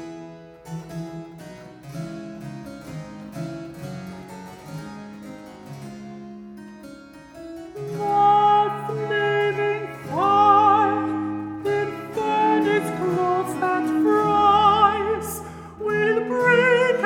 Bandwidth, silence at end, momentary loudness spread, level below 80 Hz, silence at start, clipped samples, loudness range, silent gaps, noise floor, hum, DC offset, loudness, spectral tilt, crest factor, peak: 17.5 kHz; 0 s; 23 LU; -56 dBFS; 0 s; under 0.1%; 18 LU; none; -43 dBFS; none; under 0.1%; -20 LUFS; -5.5 dB/octave; 18 dB; -4 dBFS